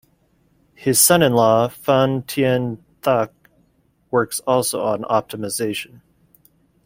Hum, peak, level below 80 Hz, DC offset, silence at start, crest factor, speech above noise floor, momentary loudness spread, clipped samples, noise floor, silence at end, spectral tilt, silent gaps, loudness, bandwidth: none; 0 dBFS; -56 dBFS; under 0.1%; 0.8 s; 20 dB; 43 dB; 13 LU; under 0.1%; -61 dBFS; 1 s; -4 dB/octave; none; -18 LUFS; 16.5 kHz